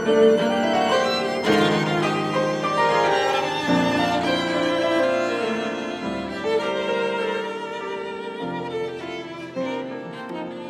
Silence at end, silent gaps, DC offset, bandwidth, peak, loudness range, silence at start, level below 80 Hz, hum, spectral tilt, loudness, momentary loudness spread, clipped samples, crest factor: 0 s; none; under 0.1%; 14 kHz; -6 dBFS; 7 LU; 0 s; -58 dBFS; none; -5 dB/octave; -22 LUFS; 11 LU; under 0.1%; 16 dB